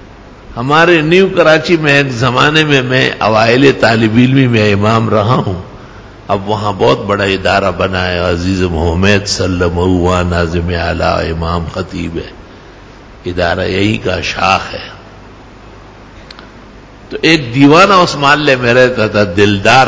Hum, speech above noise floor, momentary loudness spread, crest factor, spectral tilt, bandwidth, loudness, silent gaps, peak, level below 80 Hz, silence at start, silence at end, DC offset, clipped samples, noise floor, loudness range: none; 24 dB; 12 LU; 12 dB; -5.5 dB/octave; 8 kHz; -10 LUFS; none; 0 dBFS; -28 dBFS; 0 s; 0 s; under 0.1%; 0.7%; -34 dBFS; 8 LU